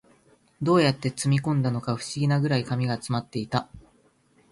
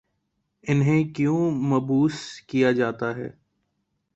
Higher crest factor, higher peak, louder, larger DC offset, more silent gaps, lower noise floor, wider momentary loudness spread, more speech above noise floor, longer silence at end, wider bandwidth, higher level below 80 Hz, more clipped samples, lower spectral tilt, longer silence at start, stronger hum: about the same, 18 dB vs 16 dB; about the same, -8 dBFS vs -8 dBFS; about the same, -25 LUFS vs -23 LUFS; neither; neither; second, -62 dBFS vs -75 dBFS; second, 9 LU vs 14 LU; second, 38 dB vs 53 dB; second, 0.7 s vs 0.9 s; first, 11.5 kHz vs 8.2 kHz; about the same, -58 dBFS vs -62 dBFS; neither; second, -6 dB/octave vs -7.5 dB/octave; about the same, 0.6 s vs 0.65 s; neither